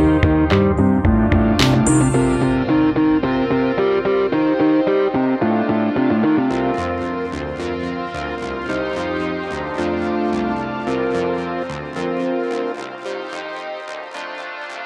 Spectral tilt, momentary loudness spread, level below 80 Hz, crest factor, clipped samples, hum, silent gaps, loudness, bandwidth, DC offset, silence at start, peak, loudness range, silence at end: -6.5 dB/octave; 13 LU; -34 dBFS; 18 dB; under 0.1%; none; none; -19 LUFS; 12 kHz; under 0.1%; 0 s; 0 dBFS; 8 LU; 0 s